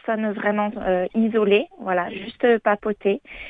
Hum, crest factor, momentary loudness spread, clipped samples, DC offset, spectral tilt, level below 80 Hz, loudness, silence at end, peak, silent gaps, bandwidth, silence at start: none; 16 dB; 6 LU; under 0.1%; under 0.1%; -8.5 dB/octave; -54 dBFS; -22 LUFS; 0 s; -6 dBFS; none; 4.6 kHz; 0.05 s